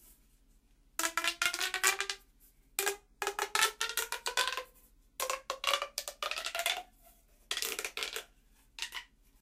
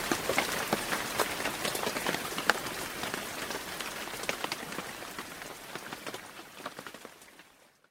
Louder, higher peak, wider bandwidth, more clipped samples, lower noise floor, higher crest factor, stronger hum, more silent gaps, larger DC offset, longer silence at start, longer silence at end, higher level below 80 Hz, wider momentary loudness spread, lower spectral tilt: about the same, -34 LUFS vs -34 LUFS; second, -14 dBFS vs -2 dBFS; second, 16 kHz vs 19.5 kHz; neither; first, -65 dBFS vs -60 dBFS; second, 24 dB vs 34 dB; neither; neither; neither; about the same, 0.05 s vs 0 s; about the same, 0.35 s vs 0.25 s; about the same, -66 dBFS vs -62 dBFS; about the same, 12 LU vs 14 LU; second, 1.5 dB/octave vs -2 dB/octave